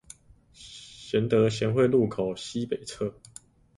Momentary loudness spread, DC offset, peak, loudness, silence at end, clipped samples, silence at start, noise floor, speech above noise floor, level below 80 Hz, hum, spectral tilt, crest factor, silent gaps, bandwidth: 21 LU; under 0.1%; -10 dBFS; -27 LUFS; 0.65 s; under 0.1%; 0.6 s; -56 dBFS; 30 dB; -58 dBFS; none; -6.5 dB/octave; 18 dB; none; 11.5 kHz